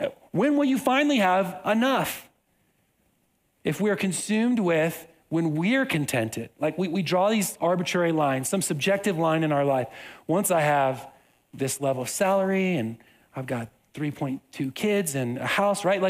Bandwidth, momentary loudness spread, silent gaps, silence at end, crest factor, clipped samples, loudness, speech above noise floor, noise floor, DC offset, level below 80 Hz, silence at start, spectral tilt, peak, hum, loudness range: 16 kHz; 11 LU; none; 0 s; 16 dB; under 0.1%; -25 LUFS; 45 dB; -69 dBFS; under 0.1%; -68 dBFS; 0 s; -5 dB/octave; -8 dBFS; none; 4 LU